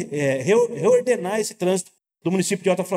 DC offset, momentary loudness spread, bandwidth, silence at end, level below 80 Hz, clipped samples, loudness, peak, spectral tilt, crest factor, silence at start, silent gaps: under 0.1%; 7 LU; 16 kHz; 0 s; -80 dBFS; under 0.1%; -21 LUFS; -8 dBFS; -5 dB/octave; 14 dB; 0 s; none